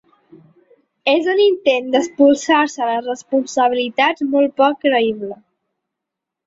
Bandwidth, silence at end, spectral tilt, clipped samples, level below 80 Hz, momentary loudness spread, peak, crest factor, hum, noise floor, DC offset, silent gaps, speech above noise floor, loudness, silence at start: 7.8 kHz; 1.1 s; -3 dB/octave; under 0.1%; -66 dBFS; 7 LU; -2 dBFS; 16 dB; none; -82 dBFS; under 0.1%; none; 66 dB; -16 LUFS; 1.05 s